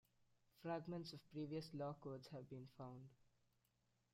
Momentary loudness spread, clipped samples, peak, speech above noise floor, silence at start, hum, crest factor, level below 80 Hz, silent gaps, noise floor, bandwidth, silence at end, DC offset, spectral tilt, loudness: 9 LU; under 0.1%; -36 dBFS; 33 dB; 0.55 s; none; 18 dB; -84 dBFS; none; -85 dBFS; 16 kHz; 0.9 s; under 0.1%; -7 dB/octave; -53 LUFS